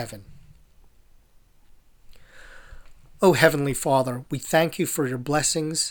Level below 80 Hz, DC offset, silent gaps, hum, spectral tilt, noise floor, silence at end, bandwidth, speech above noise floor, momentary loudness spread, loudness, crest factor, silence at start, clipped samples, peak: -50 dBFS; under 0.1%; none; none; -4 dB/octave; -55 dBFS; 0 s; over 20 kHz; 32 dB; 11 LU; -22 LUFS; 24 dB; 0 s; under 0.1%; 0 dBFS